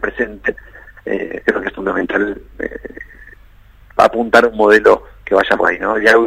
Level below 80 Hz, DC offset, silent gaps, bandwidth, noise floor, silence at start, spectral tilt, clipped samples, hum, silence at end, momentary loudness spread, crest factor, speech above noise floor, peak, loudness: -42 dBFS; under 0.1%; none; 15 kHz; -43 dBFS; 0 s; -4.5 dB/octave; 0.1%; none; 0 s; 20 LU; 16 dB; 30 dB; 0 dBFS; -15 LUFS